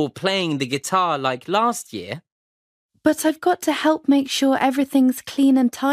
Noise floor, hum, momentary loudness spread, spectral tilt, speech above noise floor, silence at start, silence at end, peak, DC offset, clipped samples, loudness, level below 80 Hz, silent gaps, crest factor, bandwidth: under -90 dBFS; none; 6 LU; -4 dB/octave; over 70 dB; 0 s; 0 s; -4 dBFS; under 0.1%; under 0.1%; -20 LUFS; -64 dBFS; 2.32-2.89 s; 16 dB; 15.5 kHz